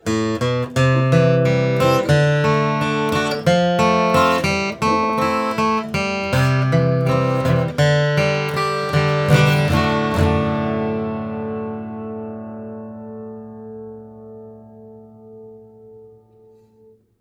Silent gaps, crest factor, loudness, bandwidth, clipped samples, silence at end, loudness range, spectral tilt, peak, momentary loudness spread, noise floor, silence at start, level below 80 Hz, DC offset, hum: none; 18 dB; -18 LUFS; 18 kHz; under 0.1%; 1.15 s; 17 LU; -6.5 dB/octave; 0 dBFS; 18 LU; -52 dBFS; 0.05 s; -44 dBFS; under 0.1%; none